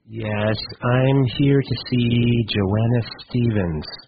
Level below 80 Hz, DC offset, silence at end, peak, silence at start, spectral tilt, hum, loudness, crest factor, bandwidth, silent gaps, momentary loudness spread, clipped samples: -42 dBFS; under 0.1%; 0.05 s; -6 dBFS; 0.1 s; -6 dB/octave; none; -20 LUFS; 14 dB; 5 kHz; none; 6 LU; under 0.1%